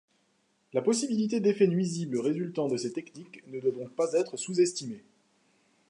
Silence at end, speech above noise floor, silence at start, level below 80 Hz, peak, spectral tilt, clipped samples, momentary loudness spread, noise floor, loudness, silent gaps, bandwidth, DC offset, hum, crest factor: 0.9 s; 43 dB; 0.75 s; -82 dBFS; -12 dBFS; -5.5 dB/octave; under 0.1%; 15 LU; -71 dBFS; -29 LUFS; none; 11.5 kHz; under 0.1%; none; 18 dB